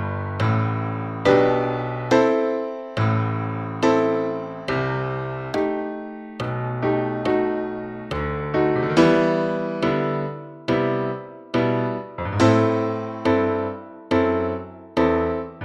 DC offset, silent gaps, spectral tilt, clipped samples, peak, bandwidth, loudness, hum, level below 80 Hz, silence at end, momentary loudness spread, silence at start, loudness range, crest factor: under 0.1%; none; -7.5 dB/octave; under 0.1%; -4 dBFS; 10 kHz; -22 LUFS; none; -48 dBFS; 0 s; 11 LU; 0 s; 4 LU; 18 dB